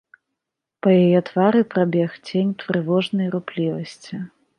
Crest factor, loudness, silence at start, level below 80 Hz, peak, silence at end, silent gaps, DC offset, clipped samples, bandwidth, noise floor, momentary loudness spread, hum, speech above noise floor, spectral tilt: 18 dB; -20 LUFS; 0.85 s; -68 dBFS; -4 dBFS; 0.3 s; none; under 0.1%; under 0.1%; 9.8 kHz; -83 dBFS; 15 LU; none; 63 dB; -8 dB/octave